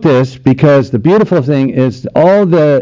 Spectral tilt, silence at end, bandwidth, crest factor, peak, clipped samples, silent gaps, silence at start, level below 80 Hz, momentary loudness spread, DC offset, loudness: -9 dB/octave; 0 s; 7.6 kHz; 8 dB; 0 dBFS; 0.2%; none; 0 s; -44 dBFS; 5 LU; under 0.1%; -10 LUFS